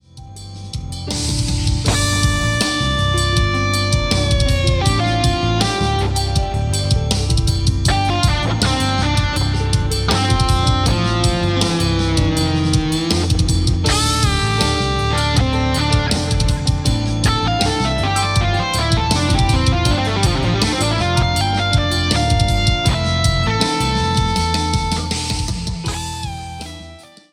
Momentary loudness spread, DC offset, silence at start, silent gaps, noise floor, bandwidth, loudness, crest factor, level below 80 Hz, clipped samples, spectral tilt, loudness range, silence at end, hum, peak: 5 LU; under 0.1%; 0.15 s; none; -39 dBFS; 16 kHz; -17 LUFS; 16 dB; -24 dBFS; under 0.1%; -4.5 dB/octave; 1 LU; 0.3 s; none; -2 dBFS